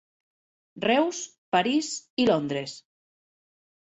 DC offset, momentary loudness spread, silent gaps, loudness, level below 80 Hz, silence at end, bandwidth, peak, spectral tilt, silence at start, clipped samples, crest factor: under 0.1%; 12 LU; 1.38-1.52 s, 2.10-2.17 s; -26 LUFS; -68 dBFS; 1.2 s; 8.4 kHz; -8 dBFS; -4 dB/octave; 0.75 s; under 0.1%; 20 dB